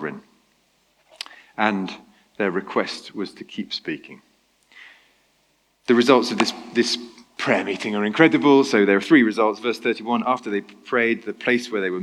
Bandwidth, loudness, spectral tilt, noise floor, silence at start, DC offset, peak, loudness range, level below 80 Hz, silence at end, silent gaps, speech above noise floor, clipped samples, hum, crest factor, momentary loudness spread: 12.5 kHz; -21 LUFS; -4.5 dB/octave; -65 dBFS; 0 s; under 0.1%; -2 dBFS; 11 LU; -72 dBFS; 0 s; none; 44 dB; under 0.1%; none; 20 dB; 18 LU